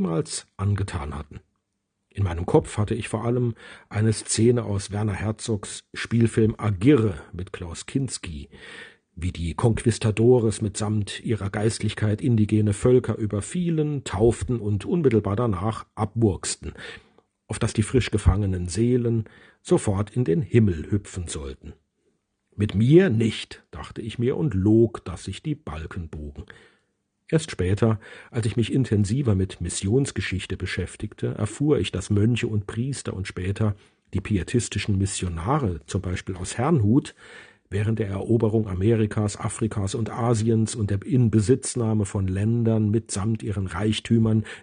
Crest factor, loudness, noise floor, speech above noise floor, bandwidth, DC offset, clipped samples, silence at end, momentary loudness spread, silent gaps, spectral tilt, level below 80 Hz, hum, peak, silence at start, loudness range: 20 dB; -24 LUFS; -78 dBFS; 54 dB; 10 kHz; under 0.1%; under 0.1%; 0 s; 14 LU; none; -6.5 dB/octave; -44 dBFS; none; -4 dBFS; 0 s; 4 LU